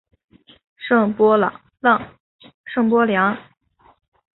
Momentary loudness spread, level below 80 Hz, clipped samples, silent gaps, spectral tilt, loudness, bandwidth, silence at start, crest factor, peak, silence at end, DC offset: 14 LU; -62 dBFS; under 0.1%; 2.20-2.39 s, 2.54-2.64 s; -11 dB/octave; -18 LUFS; 4.1 kHz; 0.8 s; 18 dB; -2 dBFS; 0.95 s; under 0.1%